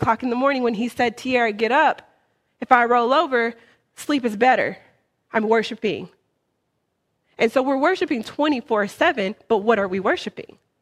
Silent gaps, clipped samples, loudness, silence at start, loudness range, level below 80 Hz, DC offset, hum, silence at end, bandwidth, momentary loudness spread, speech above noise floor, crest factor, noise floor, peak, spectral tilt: none; under 0.1%; -20 LUFS; 0 s; 4 LU; -60 dBFS; under 0.1%; none; 0.4 s; 14.5 kHz; 9 LU; 53 dB; 22 dB; -73 dBFS; 0 dBFS; -5 dB/octave